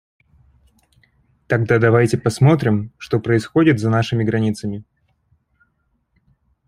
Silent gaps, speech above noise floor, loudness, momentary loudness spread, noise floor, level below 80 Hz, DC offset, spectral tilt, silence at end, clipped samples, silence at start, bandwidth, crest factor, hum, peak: none; 50 dB; -17 LUFS; 9 LU; -67 dBFS; -52 dBFS; under 0.1%; -7.5 dB/octave; 1.85 s; under 0.1%; 1.5 s; 12 kHz; 18 dB; none; 0 dBFS